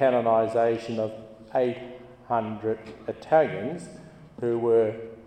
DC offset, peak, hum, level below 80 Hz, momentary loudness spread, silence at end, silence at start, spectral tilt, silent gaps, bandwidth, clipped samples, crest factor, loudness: under 0.1%; -8 dBFS; none; -64 dBFS; 18 LU; 0.05 s; 0 s; -7 dB/octave; none; 9.4 kHz; under 0.1%; 18 dB; -26 LUFS